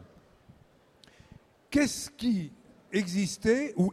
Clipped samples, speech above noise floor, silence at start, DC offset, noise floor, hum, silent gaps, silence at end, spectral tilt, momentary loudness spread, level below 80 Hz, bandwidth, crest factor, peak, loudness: under 0.1%; 33 dB; 0 s; under 0.1%; -61 dBFS; none; none; 0 s; -5 dB/octave; 6 LU; -58 dBFS; 15 kHz; 18 dB; -14 dBFS; -29 LUFS